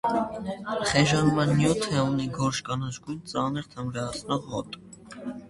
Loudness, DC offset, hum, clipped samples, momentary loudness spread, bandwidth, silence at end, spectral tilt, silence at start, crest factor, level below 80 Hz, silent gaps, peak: -27 LUFS; under 0.1%; none; under 0.1%; 14 LU; 11.5 kHz; 0 s; -5 dB/octave; 0.05 s; 20 dB; -52 dBFS; none; -8 dBFS